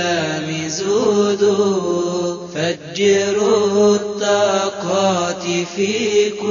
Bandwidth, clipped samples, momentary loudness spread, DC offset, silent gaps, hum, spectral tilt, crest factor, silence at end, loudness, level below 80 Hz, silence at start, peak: 7.4 kHz; under 0.1%; 7 LU; under 0.1%; none; none; -4 dB/octave; 14 dB; 0 s; -17 LUFS; -60 dBFS; 0 s; -2 dBFS